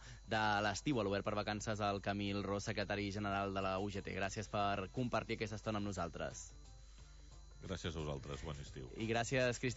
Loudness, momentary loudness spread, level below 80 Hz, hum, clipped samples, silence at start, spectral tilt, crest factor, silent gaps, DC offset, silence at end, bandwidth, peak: -40 LUFS; 17 LU; -56 dBFS; none; under 0.1%; 0 s; -4 dB/octave; 18 dB; none; under 0.1%; 0 s; 7.6 kHz; -24 dBFS